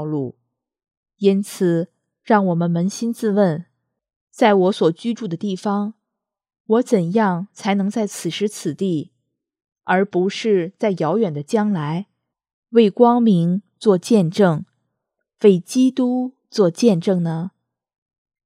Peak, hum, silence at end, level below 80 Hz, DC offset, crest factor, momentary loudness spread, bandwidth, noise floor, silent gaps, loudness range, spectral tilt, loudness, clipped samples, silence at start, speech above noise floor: 0 dBFS; none; 0.95 s; -76 dBFS; under 0.1%; 20 dB; 10 LU; 14.5 kHz; -81 dBFS; 0.97-1.03 s, 4.16-4.27 s, 6.60-6.65 s, 12.53-12.63 s; 4 LU; -6.5 dB/octave; -19 LUFS; under 0.1%; 0 s; 64 dB